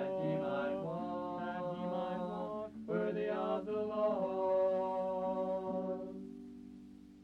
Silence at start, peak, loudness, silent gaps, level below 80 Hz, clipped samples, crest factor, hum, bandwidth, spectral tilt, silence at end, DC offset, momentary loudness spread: 0 s; -24 dBFS; -37 LUFS; none; -70 dBFS; under 0.1%; 14 dB; none; 6.4 kHz; -8.5 dB/octave; 0 s; under 0.1%; 15 LU